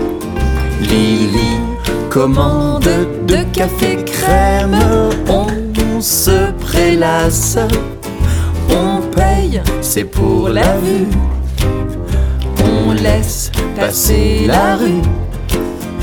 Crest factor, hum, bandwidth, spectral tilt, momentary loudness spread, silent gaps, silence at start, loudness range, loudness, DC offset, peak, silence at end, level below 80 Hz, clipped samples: 12 dB; none; 19.5 kHz; -5 dB/octave; 7 LU; none; 0 s; 2 LU; -14 LUFS; under 0.1%; 0 dBFS; 0 s; -18 dBFS; under 0.1%